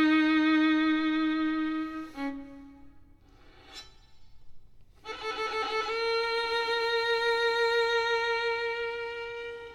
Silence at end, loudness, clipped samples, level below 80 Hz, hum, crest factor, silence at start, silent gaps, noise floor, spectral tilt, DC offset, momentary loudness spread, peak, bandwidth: 0 s; -28 LUFS; under 0.1%; -60 dBFS; none; 12 dB; 0 s; none; -55 dBFS; -3.5 dB/octave; under 0.1%; 17 LU; -16 dBFS; 11 kHz